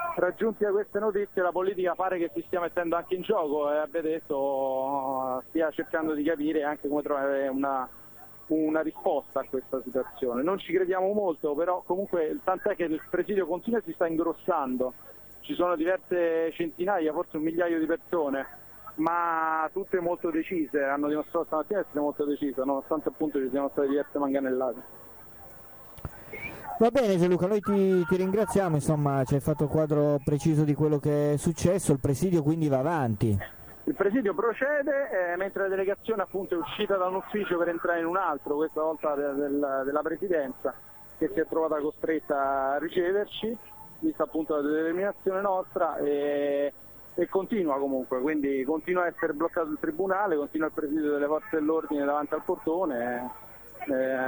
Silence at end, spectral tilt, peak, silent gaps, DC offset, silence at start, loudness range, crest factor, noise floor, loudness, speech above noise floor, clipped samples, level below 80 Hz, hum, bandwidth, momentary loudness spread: 0 s; -7 dB/octave; -10 dBFS; none; under 0.1%; 0 s; 4 LU; 18 dB; -47 dBFS; -28 LUFS; 20 dB; under 0.1%; -58 dBFS; none; over 20 kHz; 7 LU